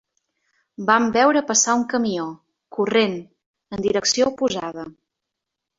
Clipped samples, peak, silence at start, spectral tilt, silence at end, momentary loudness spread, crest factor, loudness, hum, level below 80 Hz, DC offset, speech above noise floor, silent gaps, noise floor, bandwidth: under 0.1%; -2 dBFS; 0.8 s; -2.5 dB/octave; 0.85 s; 17 LU; 20 dB; -20 LUFS; none; -60 dBFS; under 0.1%; 63 dB; 3.46-3.54 s; -83 dBFS; 7.8 kHz